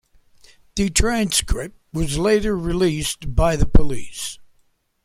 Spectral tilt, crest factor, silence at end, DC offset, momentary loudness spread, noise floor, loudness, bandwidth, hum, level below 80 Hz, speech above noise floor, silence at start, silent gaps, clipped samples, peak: -4.5 dB/octave; 18 dB; 0.6 s; under 0.1%; 11 LU; -62 dBFS; -21 LUFS; 15.5 kHz; none; -26 dBFS; 44 dB; 0.75 s; none; under 0.1%; -2 dBFS